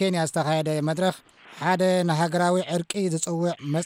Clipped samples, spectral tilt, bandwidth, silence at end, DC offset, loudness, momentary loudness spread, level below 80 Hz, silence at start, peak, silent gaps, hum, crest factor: under 0.1%; -5 dB/octave; 16 kHz; 0 s; under 0.1%; -24 LUFS; 5 LU; -70 dBFS; 0 s; -10 dBFS; none; none; 14 dB